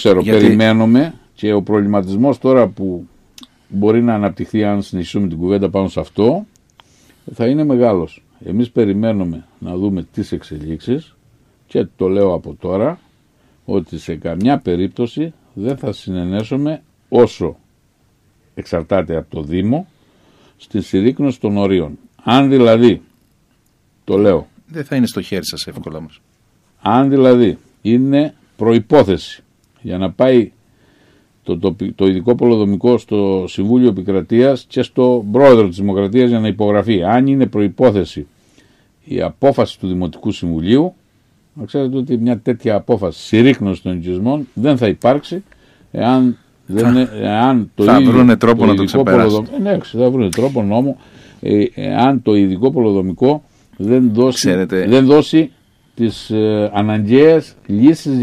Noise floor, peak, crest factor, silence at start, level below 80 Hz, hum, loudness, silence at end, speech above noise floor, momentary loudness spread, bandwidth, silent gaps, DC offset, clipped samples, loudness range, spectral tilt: -57 dBFS; 0 dBFS; 14 dB; 0 s; -46 dBFS; none; -14 LUFS; 0 s; 44 dB; 13 LU; 13.5 kHz; none; under 0.1%; under 0.1%; 7 LU; -7 dB/octave